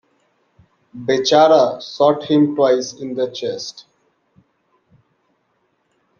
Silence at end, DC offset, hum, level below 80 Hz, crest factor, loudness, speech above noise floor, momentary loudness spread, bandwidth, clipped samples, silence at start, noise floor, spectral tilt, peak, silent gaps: 2.4 s; under 0.1%; none; -64 dBFS; 18 dB; -16 LUFS; 50 dB; 14 LU; 7.2 kHz; under 0.1%; 0.95 s; -66 dBFS; -5 dB/octave; -2 dBFS; none